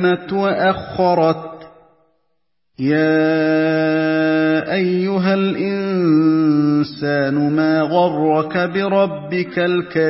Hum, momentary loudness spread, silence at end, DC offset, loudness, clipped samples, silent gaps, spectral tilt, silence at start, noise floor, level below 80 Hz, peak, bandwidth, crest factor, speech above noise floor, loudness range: none; 4 LU; 0 s; under 0.1%; -17 LUFS; under 0.1%; none; -11 dB/octave; 0 s; -74 dBFS; -56 dBFS; -2 dBFS; 5.8 kHz; 14 dB; 57 dB; 2 LU